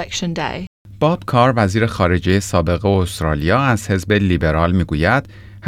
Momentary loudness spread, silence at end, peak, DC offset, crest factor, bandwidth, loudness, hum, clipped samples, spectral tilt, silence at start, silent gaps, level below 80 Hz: 7 LU; 0 s; -2 dBFS; under 0.1%; 14 dB; 15 kHz; -17 LUFS; none; under 0.1%; -6 dB/octave; 0 s; 0.67-0.85 s; -36 dBFS